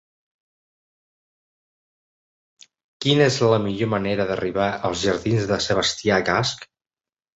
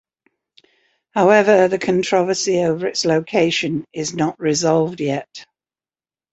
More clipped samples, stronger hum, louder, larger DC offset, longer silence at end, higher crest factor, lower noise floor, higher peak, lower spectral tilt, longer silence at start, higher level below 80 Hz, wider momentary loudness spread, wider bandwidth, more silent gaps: neither; neither; second, -21 LUFS vs -18 LUFS; neither; second, 0.75 s vs 0.9 s; about the same, 20 dB vs 18 dB; about the same, under -90 dBFS vs under -90 dBFS; about the same, -4 dBFS vs -2 dBFS; about the same, -4.5 dB/octave vs -4.5 dB/octave; first, 3 s vs 1.15 s; first, -50 dBFS vs -60 dBFS; second, 6 LU vs 10 LU; about the same, 8.2 kHz vs 8.2 kHz; neither